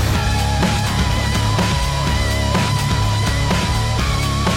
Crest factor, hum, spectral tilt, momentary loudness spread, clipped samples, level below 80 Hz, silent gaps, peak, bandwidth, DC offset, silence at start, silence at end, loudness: 10 dB; none; -4.5 dB/octave; 1 LU; under 0.1%; -24 dBFS; none; -6 dBFS; 16.5 kHz; under 0.1%; 0 s; 0 s; -18 LUFS